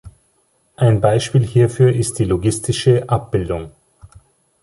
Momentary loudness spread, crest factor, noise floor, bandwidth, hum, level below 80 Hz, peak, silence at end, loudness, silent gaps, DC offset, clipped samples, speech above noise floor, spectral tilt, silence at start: 7 LU; 16 dB; -61 dBFS; 11.5 kHz; none; -40 dBFS; -2 dBFS; 0.55 s; -17 LUFS; none; under 0.1%; under 0.1%; 46 dB; -6.5 dB/octave; 0.05 s